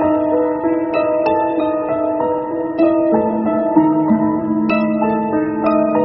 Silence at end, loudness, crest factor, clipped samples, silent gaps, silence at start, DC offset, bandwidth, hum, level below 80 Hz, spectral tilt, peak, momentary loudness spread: 0 s; -16 LUFS; 16 dB; under 0.1%; none; 0 s; under 0.1%; 5.6 kHz; none; -50 dBFS; -7 dB/octave; 0 dBFS; 4 LU